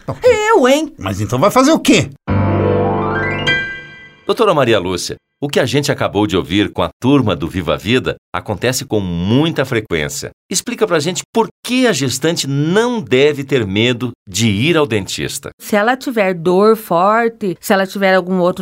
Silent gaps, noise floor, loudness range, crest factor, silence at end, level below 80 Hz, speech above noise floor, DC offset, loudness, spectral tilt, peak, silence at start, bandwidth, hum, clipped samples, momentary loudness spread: 6.93-7.00 s, 8.18-8.32 s, 10.33-10.49 s, 11.25-11.33 s, 11.51-11.63 s, 14.15-14.26 s, 15.53-15.58 s; -36 dBFS; 3 LU; 14 dB; 0 s; -42 dBFS; 22 dB; under 0.1%; -15 LUFS; -5 dB/octave; 0 dBFS; 0.1 s; 16 kHz; none; under 0.1%; 9 LU